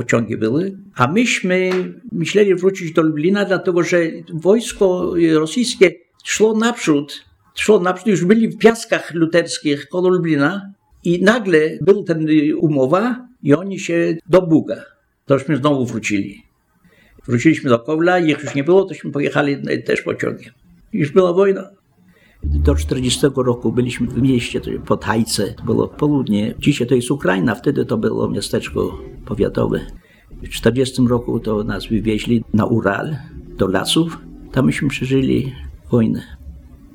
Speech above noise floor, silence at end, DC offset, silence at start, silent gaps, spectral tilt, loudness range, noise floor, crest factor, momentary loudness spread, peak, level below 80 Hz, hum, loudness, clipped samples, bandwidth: 39 dB; 0.3 s; under 0.1%; 0 s; none; -5.5 dB/octave; 3 LU; -55 dBFS; 18 dB; 9 LU; 0 dBFS; -36 dBFS; none; -17 LUFS; under 0.1%; 17.5 kHz